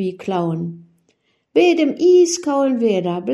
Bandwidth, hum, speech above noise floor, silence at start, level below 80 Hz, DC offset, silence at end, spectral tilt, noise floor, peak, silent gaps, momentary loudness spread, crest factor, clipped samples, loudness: 11.5 kHz; none; 48 dB; 0 s; -68 dBFS; under 0.1%; 0 s; -5.5 dB/octave; -64 dBFS; -4 dBFS; none; 10 LU; 14 dB; under 0.1%; -17 LUFS